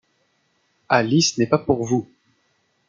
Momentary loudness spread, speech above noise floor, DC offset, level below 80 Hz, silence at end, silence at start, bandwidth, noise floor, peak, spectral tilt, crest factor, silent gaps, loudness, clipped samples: 6 LU; 48 dB; under 0.1%; -58 dBFS; 0.85 s; 0.9 s; 9.4 kHz; -67 dBFS; -2 dBFS; -4.5 dB/octave; 20 dB; none; -20 LUFS; under 0.1%